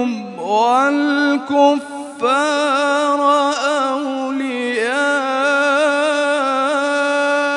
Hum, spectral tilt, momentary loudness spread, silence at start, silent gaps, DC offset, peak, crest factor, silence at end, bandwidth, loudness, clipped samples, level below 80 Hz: none; -2.5 dB/octave; 7 LU; 0 s; none; under 0.1%; -2 dBFS; 14 dB; 0 s; 11 kHz; -16 LUFS; under 0.1%; -78 dBFS